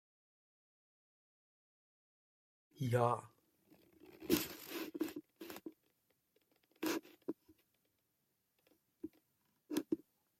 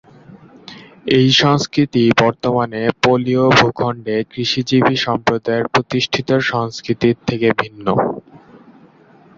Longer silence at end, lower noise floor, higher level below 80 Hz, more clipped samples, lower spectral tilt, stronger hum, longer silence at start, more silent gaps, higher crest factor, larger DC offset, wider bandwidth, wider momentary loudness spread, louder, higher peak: second, 0.45 s vs 1 s; first, -84 dBFS vs -47 dBFS; second, -78 dBFS vs -50 dBFS; neither; about the same, -5.5 dB/octave vs -5.5 dB/octave; neither; first, 2.75 s vs 0.3 s; neither; first, 26 dB vs 16 dB; neither; first, 16.5 kHz vs 7.6 kHz; first, 19 LU vs 9 LU; second, -41 LUFS vs -16 LUFS; second, -18 dBFS vs 0 dBFS